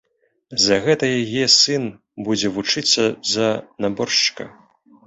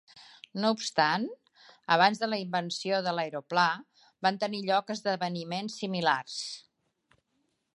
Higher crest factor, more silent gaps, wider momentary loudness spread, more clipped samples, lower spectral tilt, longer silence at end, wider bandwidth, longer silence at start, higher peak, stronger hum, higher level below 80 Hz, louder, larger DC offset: about the same, 20 dB vs 22 dB; neither; about the same, 13 LU vs 13 LU; neither; second, -2.5 dB/octave vs -4 dB/octave; second, 0.55 s vs 1.15 s; second, 8.4 kHz vs 11.5 kHz; first, 0.5 s vs 0.15 s; first, 0 dBFS vs -8 dBFS; neither; first, -58 dBFS vs -82 dBFS; first, -18 LUFS vs -29 LUFS; neither